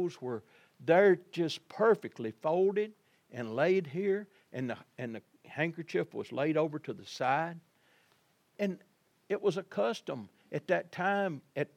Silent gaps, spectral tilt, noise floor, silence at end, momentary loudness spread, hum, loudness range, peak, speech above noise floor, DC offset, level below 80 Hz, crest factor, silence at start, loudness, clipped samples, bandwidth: none; -6.5 dB/octave; -71 dBFS; 0.1 s; 14 LU; none; 6 LU; -12 dBFS; 39 dB; under 0.1%; -88 dBFS; 20 dB; 0 s; -33 LUFS; under 0.1%; 12.5 kHz